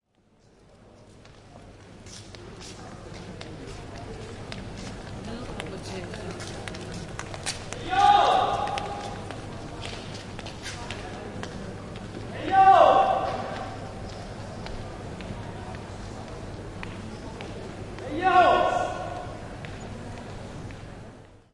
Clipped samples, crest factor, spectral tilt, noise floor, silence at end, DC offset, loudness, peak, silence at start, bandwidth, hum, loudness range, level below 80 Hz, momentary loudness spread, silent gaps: under 0.1%; 24 dB; -4.5 dB/octave; -61 dBFS; 0.2 s; under 0.1%; -27 LUFS; -4 dBFS; 0.7 s; 11.5 kHz; none; 17 LU; -48 dBFS; 21 LU; none